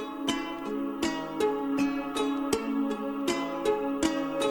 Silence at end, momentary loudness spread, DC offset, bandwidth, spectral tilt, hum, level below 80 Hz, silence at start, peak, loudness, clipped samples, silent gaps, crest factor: 0 s; 3 LU; under 0.1%; 19 kHz; -4 dB/octave; none; -56 dBFS; 0 s; -10 dBFS; -30 LUFS; under 0.1%; none; 20 dB